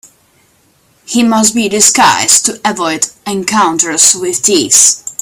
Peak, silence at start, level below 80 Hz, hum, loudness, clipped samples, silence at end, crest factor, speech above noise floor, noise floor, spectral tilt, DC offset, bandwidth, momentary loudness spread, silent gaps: 0 dBFS; 1.1 s; -52 dBFS; none; -8 LUFS; 0.7%; 0.1 s; 12 dB; 41 dB; -51 dBFS; -1.5 dB/octave; under 0.1%; over 20 kHz; 9 LU; none